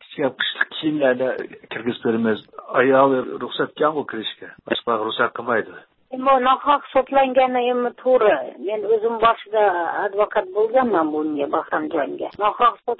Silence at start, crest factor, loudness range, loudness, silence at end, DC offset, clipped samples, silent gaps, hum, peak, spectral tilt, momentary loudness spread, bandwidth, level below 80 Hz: 0.1 s; 18 dB; 3 LU; -20 LUFS; 0.05 s; under 0.1%; under 0.1%; none; none; -2 dBFS; -9.5 dB/octave; 10 LU; 4.2 kHz; -62 dBFS